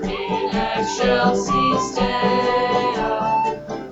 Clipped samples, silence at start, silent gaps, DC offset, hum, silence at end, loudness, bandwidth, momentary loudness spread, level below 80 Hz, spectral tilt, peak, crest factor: under 0.1%; 0 s; none; under 0.1%; none; 0 s; -20 LUFS; 8.2 kHz; 5 LU; -40 dBFS; -4.5 dB/octave; -4 dBFS; 16 dB